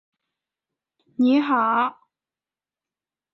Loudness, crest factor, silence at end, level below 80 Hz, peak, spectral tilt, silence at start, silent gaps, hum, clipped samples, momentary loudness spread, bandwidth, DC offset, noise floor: -21 LUFS; 18 dB; 1.4 s; -76 dBFS; -8 dBFS; -6.5 dB/octave; 1.2 s; none; none; under 0.1%; 8 LU; 5.8 kHz; under 0.1%; under -90 dBFS